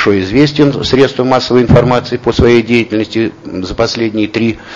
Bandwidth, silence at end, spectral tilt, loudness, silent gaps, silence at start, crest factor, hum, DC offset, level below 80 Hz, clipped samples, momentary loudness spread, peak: 7.6 kHz; 0 s; -6.5 dB/octave; -11 LUFS; none; 0 s; 10 dB; none; under 0.1%; -30 dBFS; 0.7%; 7 LU; 0 dBFS